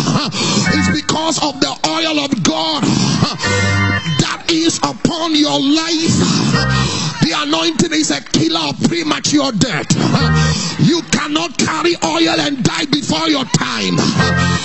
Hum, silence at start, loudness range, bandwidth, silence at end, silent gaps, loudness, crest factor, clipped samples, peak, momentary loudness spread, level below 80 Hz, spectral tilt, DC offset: none; 0 s; 1 LU; 8.6 kHz; 0 s; none; -14 LUFS; 14 dB; under 0.1%; 0 dBFS; 3 LU; -36 dBFS; -4 dB/octave; 0.6%